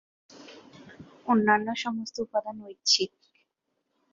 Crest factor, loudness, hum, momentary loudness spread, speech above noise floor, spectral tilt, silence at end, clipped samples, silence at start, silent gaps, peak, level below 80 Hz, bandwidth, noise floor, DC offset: 22 dB; -26 LUFS; none; 22 LU; 53 dB; -2.5 dB/octave; 1.05 s; under 0.1%; 0.35 s; none; -8 dBFS; -72 dBFS; 7.8 kHz; -80 dBFS; under 0.1%